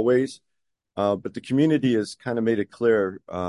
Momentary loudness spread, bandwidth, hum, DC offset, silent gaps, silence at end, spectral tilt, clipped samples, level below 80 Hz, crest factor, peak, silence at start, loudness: 9 LU; 11.5 kHz; none; under 0.1%; none; 0 s; -7 dB/octave; under 0.1%; -58 dBFS; 16 dB; -8 dBFS; 0 s; -24 LUFS